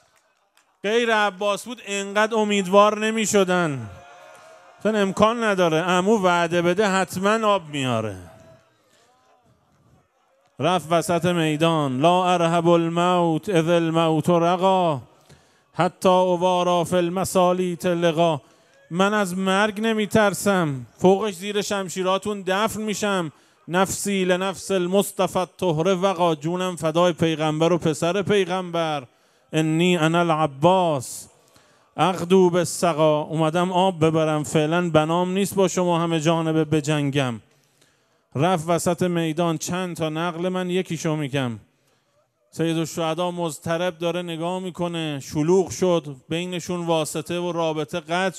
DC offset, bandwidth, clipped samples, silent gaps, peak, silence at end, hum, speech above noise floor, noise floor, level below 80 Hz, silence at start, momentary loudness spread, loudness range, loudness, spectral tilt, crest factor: under 0.1%; 15 kHz; under 0.1%; none; 0 dBFS; 0 s; none; 45 dB; -66 dBFS; -64 dBFS; 0.85 s; 8 LU; 6 LU; -21 LUFS; -5 dB/octave; 22 dB